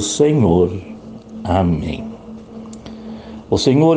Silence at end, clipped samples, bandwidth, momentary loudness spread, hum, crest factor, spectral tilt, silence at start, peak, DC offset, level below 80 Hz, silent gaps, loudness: 0 s; under 0.1%; 9.8 kHz; 21 LU; none; 16 dB; -6 dB/octave; 0 s; -2 dBFS; under 0.1%; -42 dBFS; none; -16 LUFS